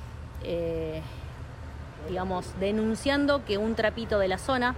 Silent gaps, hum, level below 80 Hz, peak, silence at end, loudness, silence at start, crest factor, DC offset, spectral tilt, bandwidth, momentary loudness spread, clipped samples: none; none; -44 dBFS; -14 dBFS; 0 s; -29 LUFS; 0 s; 16 dB; under 0.1%; -5.5 dB/octave; 15.5 kHz; 16 LU; under 0.1%